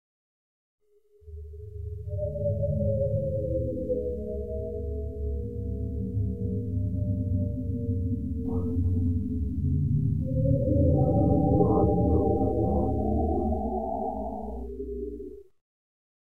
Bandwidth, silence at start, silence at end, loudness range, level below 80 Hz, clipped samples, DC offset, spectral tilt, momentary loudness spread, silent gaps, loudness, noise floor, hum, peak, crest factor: 1.4 kHz; 0.8 s; 0.65 s; 8 LU; -36 dBFS; under 0.1%; 0.6%; -13.5 dB/octave; 13 LU; none; -28 LUFS; -55 dBFS; none; -10 dBFS; 18 dB